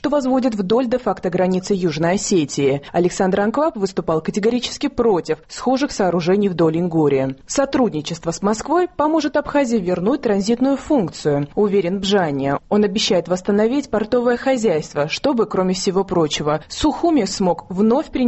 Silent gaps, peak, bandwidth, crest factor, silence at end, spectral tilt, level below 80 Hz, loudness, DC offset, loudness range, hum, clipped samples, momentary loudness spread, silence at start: none; -6 dBFS; 8.4 kHz; 12 dB; 0 s; -5.5 dB/octave; -46 dBFS; -19 LUFS; under 0.1%; 1 LU; none; under 0.1%; 4 LU; 0.05 s